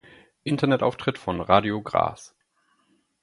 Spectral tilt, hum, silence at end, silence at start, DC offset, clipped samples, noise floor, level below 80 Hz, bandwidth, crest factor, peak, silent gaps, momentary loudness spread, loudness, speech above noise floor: -6.5 dB/octave; none; 0.95 s; 0.45 s; under 0.1%; under 0.1%; -68 dBFS; -52 dBFS; 11.5 kHz; 24 dB; -2 dBFS; none; 9 LU; -24 LUFS; 45 dB